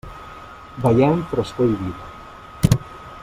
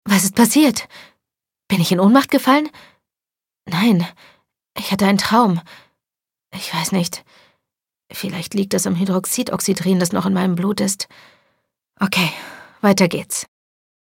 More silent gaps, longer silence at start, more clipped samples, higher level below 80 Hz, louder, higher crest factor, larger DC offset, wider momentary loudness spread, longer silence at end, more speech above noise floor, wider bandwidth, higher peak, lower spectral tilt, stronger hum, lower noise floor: neither; about the same, 0.05 s vs 0.05 s; neither; first, -40 dBFS vs -60 dBFS; about the same, -20 LUFS vs -18 LUFS; about the same, 20 dB vs 18 dB; neither; first, 21 LU vs 16 LU; second, 0 s vs 0.55 s; second, 20 dB vs 72 dB; about the same, 16 kHz vs 17 kHz; about the same, -2 dBFS vs 0 dBFS; first, -7.5 dB/octave vs -4.5 dB/octave; neither; second, -39 dBFS vs -89 dBFS